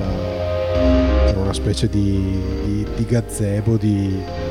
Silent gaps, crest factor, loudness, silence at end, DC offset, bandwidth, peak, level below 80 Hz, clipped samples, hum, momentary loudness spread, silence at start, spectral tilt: none; 14 dB; -19 LUFS; 0 s; under 0.1%; 14 kHz; -6 dBFS; -24 dBFS; under 0.1%; none; 7 LU; 0 s; -7 dB/octave